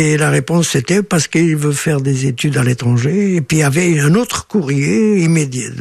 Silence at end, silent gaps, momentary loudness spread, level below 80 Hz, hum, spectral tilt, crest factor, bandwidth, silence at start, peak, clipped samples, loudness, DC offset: 0 s; none; 3 LU; -46 dBFS; none; -5.5 dB/octave; 12 dB; 14 kHz; 0 s; -2 dBFS; under 0.1%; -14 LUFS; under 0.1%